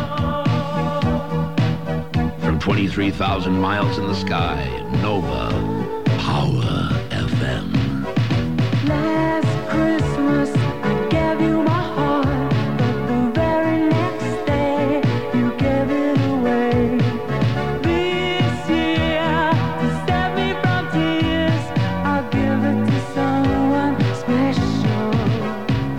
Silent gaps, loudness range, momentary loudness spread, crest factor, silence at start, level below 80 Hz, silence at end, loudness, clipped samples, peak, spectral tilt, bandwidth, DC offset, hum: none; 2 LU; 4 LU; 12 dB; 0 s; -36 dBFS; 0 s; -20 LUFS; under 0.1%; -6 dBFS; -7.5 dB/octave; 15 kHz; 2%; none